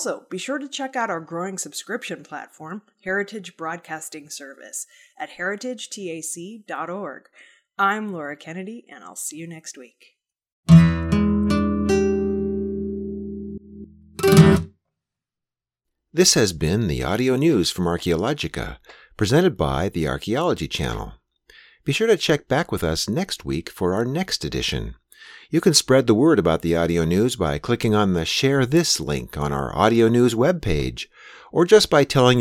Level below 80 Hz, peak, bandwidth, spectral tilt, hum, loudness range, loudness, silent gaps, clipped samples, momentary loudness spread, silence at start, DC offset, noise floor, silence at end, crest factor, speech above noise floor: -40 dBFS; 0 dBFS; 16 kHz; -5 dB/octave; none; 11 LU; -21 LUFS; 10.52-10.63 s; under 0.1%; 18 LU; 0 s; under 0.1%; -88 dBFS; 0 s; 20 dB; 66 dB